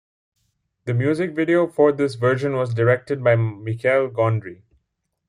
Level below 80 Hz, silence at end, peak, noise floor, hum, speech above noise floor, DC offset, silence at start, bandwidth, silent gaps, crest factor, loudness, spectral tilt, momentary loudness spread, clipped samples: -62 dBFS; 0.75 s; -4 dBFS; -75 dBFS; none; 56 dB; under 0.1%; 0.85 s; 11 kHz; none; 18 dB; -20 LUFS; -8 dB/octave; 7 LU; under 0.1%